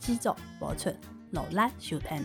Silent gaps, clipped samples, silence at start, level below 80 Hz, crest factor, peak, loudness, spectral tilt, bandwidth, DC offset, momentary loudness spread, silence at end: none; under 0.1%; 0 s; -48 dBFS; 18 dB; -14 dBFS; -33 LUFS; -5 dB/octave; 19 kHz; under 0.1%; 9 LU; 0 s